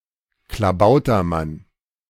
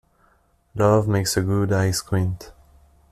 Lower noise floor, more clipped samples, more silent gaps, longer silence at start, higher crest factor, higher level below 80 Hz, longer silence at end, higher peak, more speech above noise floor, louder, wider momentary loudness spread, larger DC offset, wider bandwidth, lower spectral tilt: about the same, -60 dBFS vs -61 dBFS; neither; neither; second, 0.5 s vs 0.75 s; about the same, 16 dB vs 18 dB; first, -40 dBFS vs -48 dBFS; about the same, 0.5 s vs 0.6 s; about the same, -4 dBFS vs -4 dBFS; about the same, 43 dB vs 41 dB; first, -18 LUFS vs -21 LUFS; first, 19 LU vs 10 LU; neither; first, 16 kHz vs 14.5 kHz; first, -7.5 dB/octave vs -5.5 dB/octave